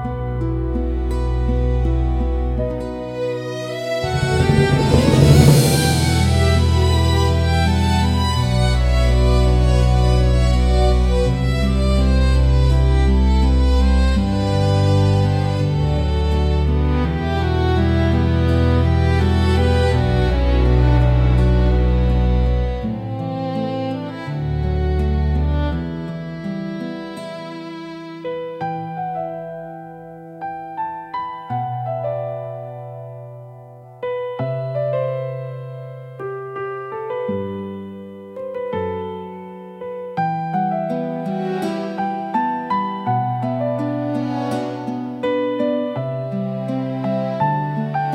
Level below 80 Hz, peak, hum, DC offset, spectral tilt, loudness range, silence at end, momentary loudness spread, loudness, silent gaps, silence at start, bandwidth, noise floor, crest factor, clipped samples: -22 dBFS; 0 dBFS; none; under 0.1%; -6.5 dB/octave; 12 LU; 0 s; 14 LU; -19 LUFS; none; 0 s; 15 kHz; -39 dBFS; 18 dB; under 0.1%